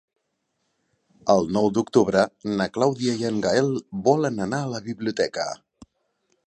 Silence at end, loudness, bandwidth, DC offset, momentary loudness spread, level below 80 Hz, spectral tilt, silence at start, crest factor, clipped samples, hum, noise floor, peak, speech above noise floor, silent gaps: 0.95 s; -23 LUFS; 10.5 kHz; under 0.1%; 9 LU; -58 dBFS; -5.5 dB/octave; 1.25 s; 20 dB; under 0.1%; none; -75 dBFS; -4 dBFS; 53 dB; none